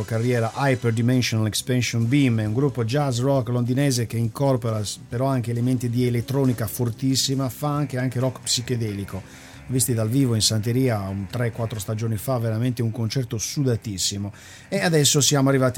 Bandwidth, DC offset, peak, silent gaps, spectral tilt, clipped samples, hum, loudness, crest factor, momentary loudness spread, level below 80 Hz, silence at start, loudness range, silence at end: 17.5 kHz; under 0.1%; -6 dBFS; none; -5 dB/octave; under 0.1%; none; -23 LUFS; 16 dB; 8 LU; -52 dBFS; 0 s; 3 LU; 0 s